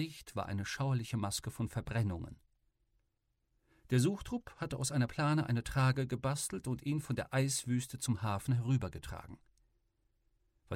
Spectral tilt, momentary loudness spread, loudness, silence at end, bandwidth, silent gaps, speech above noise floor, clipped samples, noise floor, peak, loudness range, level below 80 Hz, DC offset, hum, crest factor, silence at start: -5.5 dB/octave; 10 LU; -36 LUFS; 0 s; 16 kHz; none; 46 dB; under 0.1%; -81 dBFS; -18 dBFS; 5 LU; -58 dBFS; under 0.1%; none; 18 dB; 0 s